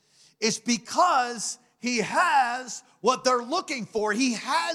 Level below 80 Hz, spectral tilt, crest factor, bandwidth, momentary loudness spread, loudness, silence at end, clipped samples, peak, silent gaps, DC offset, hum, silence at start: -72 dBFS; -2.5 dB/octave; 16 dB; 15 kHz; 10 LU; -25 LUFS; 0 s; under 0.1%; -10 dBFS; none; under 0.1%; none; 0.4 s